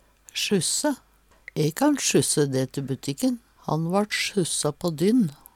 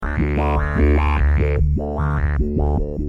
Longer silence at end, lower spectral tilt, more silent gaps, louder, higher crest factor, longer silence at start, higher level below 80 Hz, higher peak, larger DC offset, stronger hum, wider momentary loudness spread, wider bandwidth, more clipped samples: first, 0.2 s vs 0 s; second, -4 dB/octave vs -9.5 dB/octave; neither; second, -24 LUFS vs -19 LUFS; about the same, 16 dB vs 14 dB; first, 0.35 s vs 0 s; second, -60 dBFS vs -20 dBFS; second, -8 dBFS vs -4 dBFS; neither; neither; first, 9 LU vs 4 LU; first, 17.5 kHz vs 4.7 kHz; neither